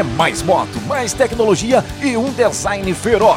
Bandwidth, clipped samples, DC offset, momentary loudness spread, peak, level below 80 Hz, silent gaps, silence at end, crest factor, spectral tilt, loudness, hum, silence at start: 16.5 kHz; under 0.1%; under 0.1%; 6 LU; -2 dBFS; -36 dBFS; none; 0 s; 14 dB; -4.5 dB/octave; -16 LUFS; none; 0 s